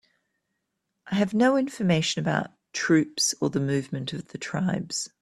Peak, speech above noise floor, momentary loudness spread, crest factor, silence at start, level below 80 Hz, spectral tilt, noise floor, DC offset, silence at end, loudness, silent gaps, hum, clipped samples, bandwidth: -8 dBFS; 55 dB; 11 LU; 20 dB; 1.05 s; -64 dBFS; -4.5 dB/octave; -80 dBFS; under 0.1%; 0.15 s; -26 LUFS; none; none; under 0.1%; 13.5 kHz